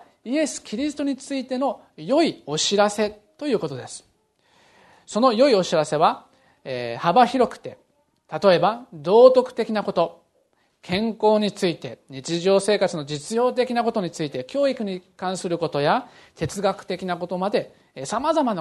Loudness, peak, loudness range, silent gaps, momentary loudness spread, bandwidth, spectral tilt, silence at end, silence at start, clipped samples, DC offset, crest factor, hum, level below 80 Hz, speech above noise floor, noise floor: -22 LUFS; 0 dBFS; 5 LU; none; 14 LU; 12.5 kHz; -4.5 dB/octave; 0 s; 0.25 s; under 0.1%; under 0.1%; 22 dB; none; -62 dBFS; 44 dB; -66 dBFS